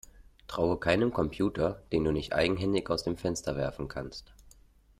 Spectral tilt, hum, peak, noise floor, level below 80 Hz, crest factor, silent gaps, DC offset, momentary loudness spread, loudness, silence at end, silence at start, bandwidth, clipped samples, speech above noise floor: -5.5 dB/octave; none; -12 dBFS; -59 dBFS; -50 dBFS; 20 dB; none; under 0.1%; 11 LU; -30 LUFS; 0.5 s; 0.2 s; 15 kHz; under 0.1%; 29 dB